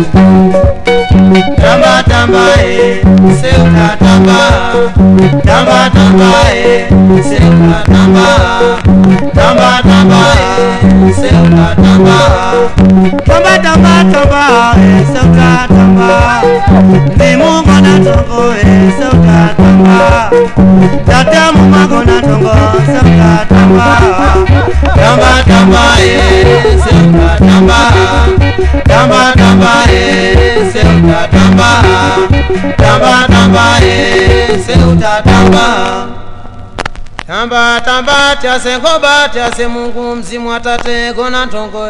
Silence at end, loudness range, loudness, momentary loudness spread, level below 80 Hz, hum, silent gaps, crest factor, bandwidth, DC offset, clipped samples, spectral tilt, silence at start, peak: 0 s; 4 LU; -6 LUFS; 6 LU; -16 dBFS; none; none; 6 dB; 11 kHz; under 0.1%; 20%; -6 dB/octave; 0 s; 0 dBFS